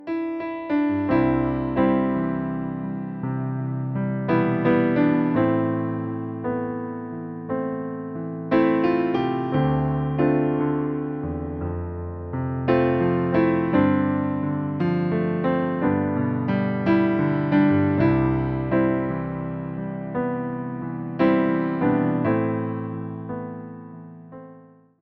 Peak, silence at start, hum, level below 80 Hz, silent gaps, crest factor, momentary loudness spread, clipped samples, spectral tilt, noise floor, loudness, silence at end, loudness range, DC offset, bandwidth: -6 dBFS; 0 s; none; -46 dBFS; none; 18 dB; 11 LU; under 0.1%; -11 dB/octave; -49 dBFS; -23 LUFS; 0.4 s; 4 LU; under 0.1%; 5.4 kHz